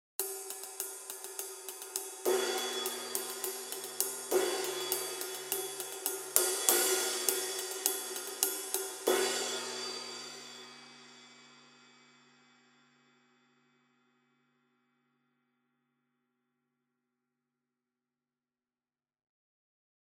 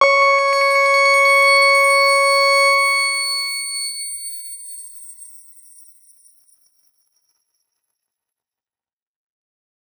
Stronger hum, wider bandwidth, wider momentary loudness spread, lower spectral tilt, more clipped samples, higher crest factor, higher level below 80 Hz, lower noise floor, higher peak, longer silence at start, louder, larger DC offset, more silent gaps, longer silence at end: neither; second, 17.5 kHz vs over 20 kHz; second, 14 LU vs 20 LU; first, 0.5 dB/octave vs 4.5 dB/octave; neither; first, 38 dB vs 18 dB; about the same, under -90 dBFS vs under -90 dBFS; about the same, under -90 dBFS vs under -90 dBFS; about the same, -2 dBFS vs -2 dBFS; first, 0.2 s vs 0 s; second, -33 LUFS vs -13 LUFS; neither; neither; first, 8.15 s vs 4.65 s